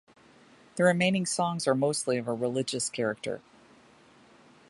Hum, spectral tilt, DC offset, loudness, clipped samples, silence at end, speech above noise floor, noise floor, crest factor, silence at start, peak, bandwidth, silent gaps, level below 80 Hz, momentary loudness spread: none; -4.5 dB/octave; under 0.1%; -28 LUFS; under 0.1%; 1.3 s; 30 dB; -58 dBFS; 20 dB; 0.75 s; -10 dBFS; 11.5 kHz; none; -70 dBFS; 12 LU